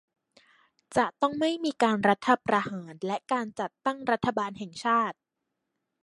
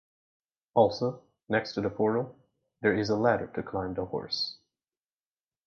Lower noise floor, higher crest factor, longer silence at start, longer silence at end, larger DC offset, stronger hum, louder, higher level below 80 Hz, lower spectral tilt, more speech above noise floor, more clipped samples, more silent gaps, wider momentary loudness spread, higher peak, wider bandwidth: second, -83 dBFS vs under -90 dBFS; about the same, 22 dB vs 22 dB; first, 0.9 s vs 0.75 s; second, 0.9 s vs 1.1 s; neither; neither; about the same, -28 LUFS vs -29 LUFS; second, -68 dBFS vs -60 dBFS; about the same, -5 dB/octave vs -6 dB/octave; second, 56 dB vs over 62 dB; neither; neither; about the same, 9 LU vs 9 LU; about the same, -8 dBFS vs -10 dBFS; first, 11.5 kHz vs 7 kHz